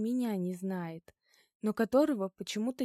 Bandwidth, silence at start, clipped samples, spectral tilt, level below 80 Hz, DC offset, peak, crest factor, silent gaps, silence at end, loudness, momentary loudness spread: 15 kHz; 0 s; under 0.1%; -6 dB/octave; -76 dBFS; under 0.1%; -14 dBFS; 18 dB; 1.55-1.60 s; 0 s; -33 LUFS; 11 LU